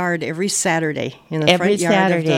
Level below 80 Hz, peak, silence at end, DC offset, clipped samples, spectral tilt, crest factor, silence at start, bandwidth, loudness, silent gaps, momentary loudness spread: -58 dBFS; 0 dBFS; 0 s; under 0.1%; under 0.1%; -4 dB/octave; 18 dB; 0 s; 16.5 kHz; -18 LUFS; none; 8 LU